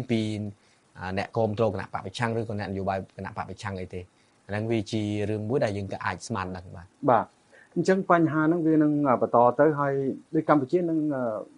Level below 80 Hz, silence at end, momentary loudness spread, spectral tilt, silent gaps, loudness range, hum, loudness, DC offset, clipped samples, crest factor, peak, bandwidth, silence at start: -62 dBFS; 0.15 s; 14 LU; -7 dB/octave; none; 8 LU; none; -26 LUFS; under 0.1%; under 0.1%; 22 dB; -4 dBFS; 11 kHz; 0 s